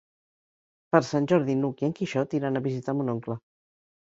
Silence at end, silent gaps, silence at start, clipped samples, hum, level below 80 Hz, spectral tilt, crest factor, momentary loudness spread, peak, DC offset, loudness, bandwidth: 0.65 s; none; 0.95 s; under 0.1%; none; -68 dBFS; -7.5 dB/octave; 24 dB; 8 LU; -4 dBFS; under 0.1%; -27 LUFS; 7.8 kHz